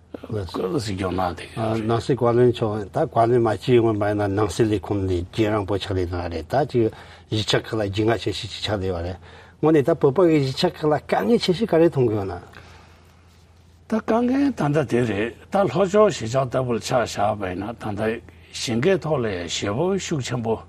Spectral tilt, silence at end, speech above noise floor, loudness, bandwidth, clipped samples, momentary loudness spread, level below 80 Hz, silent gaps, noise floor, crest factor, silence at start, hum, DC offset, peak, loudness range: -6 dB/octave; 0.05 s; 30 dB; -22 LUFS; 14.5 kHz; under 0.1%; 9 LU; -52 dBFS; none; -51 dBFS; 18 dB; 0.15 s; none; under 0.1%; -4 dBFS; 4 LU